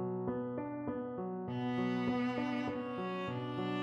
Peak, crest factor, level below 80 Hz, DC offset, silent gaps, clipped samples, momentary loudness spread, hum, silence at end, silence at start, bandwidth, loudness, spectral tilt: -24 dBFS; 14 dB; -70 dBFS; under 0.1%; none; under 0.1%; 5 LU; none; 0 s; 0 s; 7.4 kHz; -38 LUFS; -8 dB/octave